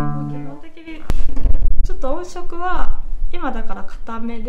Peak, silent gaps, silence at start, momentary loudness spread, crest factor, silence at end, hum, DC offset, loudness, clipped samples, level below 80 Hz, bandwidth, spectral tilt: 0 dBFS; none; 0 s; 10 LU; 12 dB; 0 s; none; 1%; -27 LUFS; under 0.1%; -20 dBFS; 3.8 kHz; -7 dB/octave